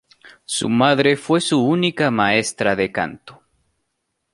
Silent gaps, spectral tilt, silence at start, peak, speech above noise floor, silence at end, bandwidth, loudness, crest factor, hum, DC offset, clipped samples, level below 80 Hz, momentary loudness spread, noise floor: none; -4.5 dB/octave; 0.25 s; -2 dBFS; 56 dB; 1 s; 11.5 kHz; -18 LUFS; 18 dB; none; under 0.1%; under 0.1%; -58 dBFS; 8 LU; -74 dBFS